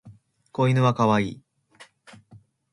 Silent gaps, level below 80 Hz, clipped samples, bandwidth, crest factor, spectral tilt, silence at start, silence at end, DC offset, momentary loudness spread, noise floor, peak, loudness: none; -60 dBFS; under 0.1%; 10.5 kHz; 18 dB; -7.5 dB/octave; 0.05 s; 0.9 s; under 0.1%; 16 LU; -54 dBFS; -8 dBFS; -22 LUFS